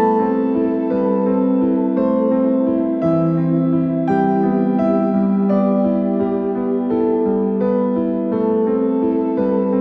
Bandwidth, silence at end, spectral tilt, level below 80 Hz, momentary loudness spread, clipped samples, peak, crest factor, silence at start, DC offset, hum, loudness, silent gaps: 4.2 kHz; 0 s; -11.5 dB/octave; -52 dBFS; 2 LU; under 0.1%; -4 dBFS; 12 dB; 0 s; under 0.1%; none; -17 LUFS; none